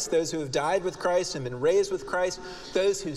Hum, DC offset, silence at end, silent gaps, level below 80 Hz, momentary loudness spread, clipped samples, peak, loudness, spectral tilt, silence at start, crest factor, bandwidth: none; under 0.1%; 0 s; none; -54 dBFS; 6 LU; under 0.1%; -12 dBFS; -27 LUFS; -4 dB/octave; 0 s; 14 dB; 13.5 kHz